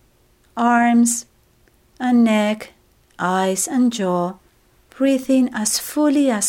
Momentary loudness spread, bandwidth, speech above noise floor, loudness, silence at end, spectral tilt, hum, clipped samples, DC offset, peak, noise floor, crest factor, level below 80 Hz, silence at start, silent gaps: 10 LU; 16.5 kHz; 39 dB; -18 LUFS; 0 s; -4 dB/octave; none; under 0.1%; under 0.1%; -4 dBFS; -57 dBFS; 14 dB; -60 dBFS; 0.55 s; none